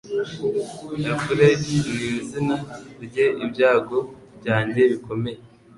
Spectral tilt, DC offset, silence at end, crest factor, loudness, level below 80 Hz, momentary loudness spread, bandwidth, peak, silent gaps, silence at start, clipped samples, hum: -6 dB/octave; under 0.1%; 0.3 s; 18 dB; -22 LUFS; -54 dBFS; 14 LU; 11.5 kHz; -4 dBFS; none; 0.05 s; under 0.1%; none